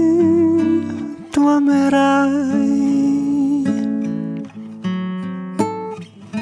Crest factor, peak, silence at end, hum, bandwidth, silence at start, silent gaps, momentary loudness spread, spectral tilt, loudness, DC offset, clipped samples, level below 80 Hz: 14 dB; -2 dBFS; 0 s; none; 11 kHz; 0 s; none; 14 LU; -7 dB/octave; -17 LUFS; under 0.1%; under 0.1%; -58 dBFS